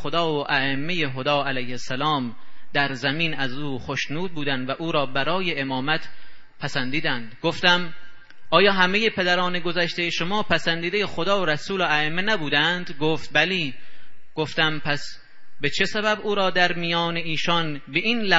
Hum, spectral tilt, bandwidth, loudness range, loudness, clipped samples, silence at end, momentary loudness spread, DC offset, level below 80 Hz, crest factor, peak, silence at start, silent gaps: none; -4.5 dB/octave; 8 kHz; 4 LU; -23 LUFS; under 0.1%; 0 s; 8 LU; under 0.1%; -56 dBFS; 22 dB; -2 dBFS; 0 s; none